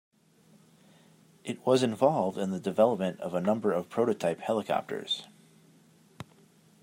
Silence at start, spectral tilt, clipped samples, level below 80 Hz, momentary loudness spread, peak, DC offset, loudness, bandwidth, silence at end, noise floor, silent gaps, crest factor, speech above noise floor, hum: 1.45 s; -6 dB/octave; under 0.1%; -78 dBFS; 17 LU; -10 dBFS; under 0.1%; -29 LUFS; 16 kHz; 0.6 s; -61 dBFS; none; 22 dB; 33 dB; none